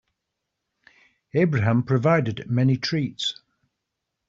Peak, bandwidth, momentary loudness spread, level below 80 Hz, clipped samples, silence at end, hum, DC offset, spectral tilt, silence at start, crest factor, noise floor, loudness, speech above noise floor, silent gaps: -6 dBFS; 7.8 kHz; 8 LU; -60 dBFS; under 0.1%; 0.95 s; none; under 0.1%; -5.5 dB/octave; 1.35 s; 18 dB; -81 dBFS; -23 LUFS; 60 dB; none